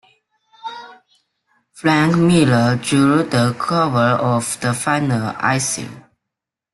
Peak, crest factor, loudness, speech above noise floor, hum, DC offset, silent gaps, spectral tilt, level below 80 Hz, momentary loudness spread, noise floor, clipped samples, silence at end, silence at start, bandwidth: -2 dBFS; 16 dB; -16 LUFS; 67 dB; none; under 0.1%; none; -5.5 dB/octave; -52 dBFS; 19 LU; -83 dBFS; under 0.1%; 0.75 s; 0.65 s; 12.5 kHz